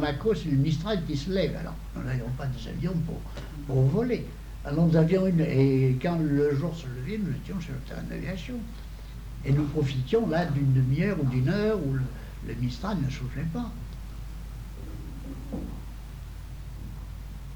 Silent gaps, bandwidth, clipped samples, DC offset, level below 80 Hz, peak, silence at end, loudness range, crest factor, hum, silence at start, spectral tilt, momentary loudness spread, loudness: none; 19.5 kHz; under 0.1%; under 0.1%; -40 dBFS; -10 dBFS; 0 s; 11 LU; 18 dB; none; 0 s; -8 dB/octave; 17 LU; -28 LUFS